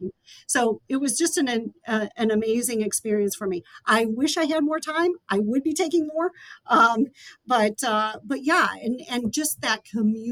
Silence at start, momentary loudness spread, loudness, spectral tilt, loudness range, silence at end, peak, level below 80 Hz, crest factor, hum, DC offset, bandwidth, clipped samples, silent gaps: 0 s; 8 LU; -23 LUFS; -3.5 dB/octave; 2 LU; 0 s; -6 dBFS; -66 dBFS; 18 dB; none; under 0.1%; 19 kHz; under 0.1%; none